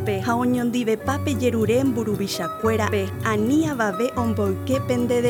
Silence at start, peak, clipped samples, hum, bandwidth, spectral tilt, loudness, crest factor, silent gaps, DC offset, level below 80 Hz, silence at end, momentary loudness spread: 0 s; -6 dBFS; under 0.1%; none; 19.5 kHz; -6 dB/octave; -22 LUFS; 16 dB; none; under 0.1%; -54 dBFS; 0 s; 4 LU